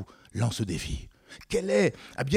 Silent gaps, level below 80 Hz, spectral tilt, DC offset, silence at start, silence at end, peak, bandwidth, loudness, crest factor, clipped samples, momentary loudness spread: none; -46 dBFS; -5.5 dB/octave; under 0.1%; 0 s; 0 s; -8 dBFS; 15.5 kHz; -29 LUFS; 20 dB; under 0.1%; 16 LU